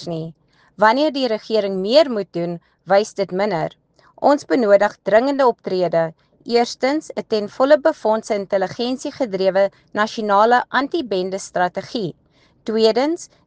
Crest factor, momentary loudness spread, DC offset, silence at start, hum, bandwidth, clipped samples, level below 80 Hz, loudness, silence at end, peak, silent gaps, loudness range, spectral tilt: 18 dB; 11 LU; under 0.1%; 0 s; none; 9.4 kHz; under 0.1%; -64 dBFS; -19 LUFS; 0.2 s; 0 dBFS; none; 2 LU; -5 dB/octave